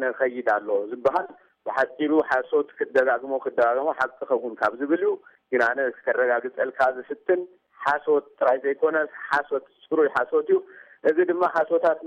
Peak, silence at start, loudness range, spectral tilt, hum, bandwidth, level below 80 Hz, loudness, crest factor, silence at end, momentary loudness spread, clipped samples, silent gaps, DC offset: -10 dBFS; 0 s; 1 LU; -6 dB/octave; none; 8.6 kHz; -70 dBFS; -24 LUFS; 14 dB; 0 s; 6 LU; under 0.1%; none; under 0.1%